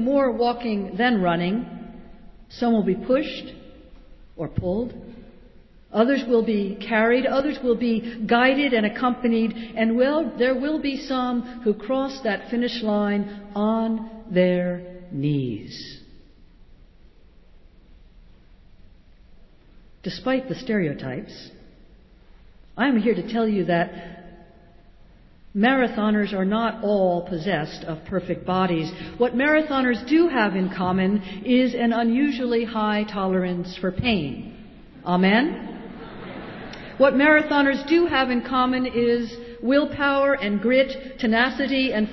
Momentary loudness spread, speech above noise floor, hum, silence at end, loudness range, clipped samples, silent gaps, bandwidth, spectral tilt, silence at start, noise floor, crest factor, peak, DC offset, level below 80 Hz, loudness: 15 LU; 28 dB; none; 0 s; 9 LU; under 0.1%; none; 6 kHz; -7.5 dB/octave; 0 s; -50 dBFS; 18 dB; -6 dBFS; under 0.1%; -50 dBFS; -22 LUFS